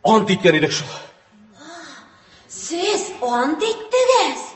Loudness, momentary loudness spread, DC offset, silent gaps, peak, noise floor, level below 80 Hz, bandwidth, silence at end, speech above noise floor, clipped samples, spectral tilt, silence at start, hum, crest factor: -18 LUFS; 22 LU; under 0.1%; none; 0 dBFS; -49 dBFS; -60 dBFS; 8.6 kHz; 0 s; 32 dB; under 0.1%; -4 dB/octave; 0.05 s; none; 20 dB